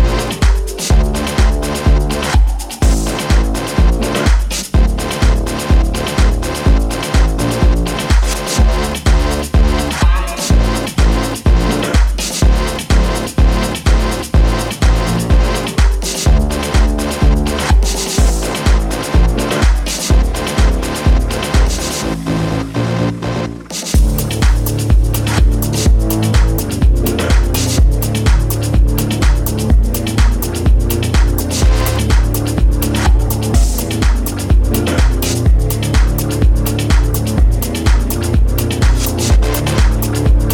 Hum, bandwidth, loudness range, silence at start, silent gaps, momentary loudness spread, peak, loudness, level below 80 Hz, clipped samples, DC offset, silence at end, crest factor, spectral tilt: none; 18.5 kHz; 1 LU; 0 s; none; 3 LU; 0 dBFS; -15 LUFS; -14 dBFS; under 0.1%; under 0.1%; 0 s; 12 dB; -5 dB/octave